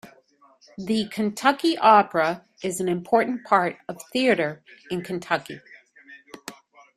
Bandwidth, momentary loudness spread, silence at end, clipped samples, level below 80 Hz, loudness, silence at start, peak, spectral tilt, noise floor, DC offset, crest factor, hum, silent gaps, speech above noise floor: 15 kHz; 23 LU; 0.45 s; under 0.1%; -68 dBFS; -23 LUFS; 0.05 s; -2 dBFS; -4.5 dB/octave; -58 dBFS; under 0.1%; 22 dB; none; none; 35 dB